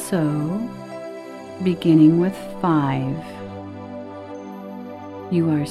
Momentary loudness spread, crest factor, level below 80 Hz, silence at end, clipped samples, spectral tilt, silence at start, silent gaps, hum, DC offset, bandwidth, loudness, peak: 20 LU; 18 dB; -58 dBFS; 0 s; under 0.1%; -7.5 dB/octave; 0 s; none; none; under 0.1%; 13.5 kHz; -20 LUFS; -4 dBFS